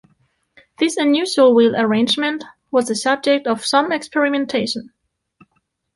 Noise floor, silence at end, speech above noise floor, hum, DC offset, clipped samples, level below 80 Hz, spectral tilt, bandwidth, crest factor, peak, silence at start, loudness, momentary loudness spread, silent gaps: -68 dBFS; 1.1 s; 51 dB; none; under 0.1%; under 0.1%; -64 dBFS; -3.5 dB/octave; 11.5 kHz; 16 dB; -2 dBFS; 0.8 s; -17 LUFS; 8 LU; none